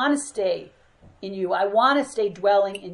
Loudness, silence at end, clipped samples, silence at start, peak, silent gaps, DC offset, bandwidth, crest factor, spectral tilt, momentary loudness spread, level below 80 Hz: -22 LUFS; 0 s; under 0.1%; 0 s; -6 dBFS; none; under 0.1%; 11.5 kHz; 18 dB; -4 dB/octave; 12 LU; -64 dBFS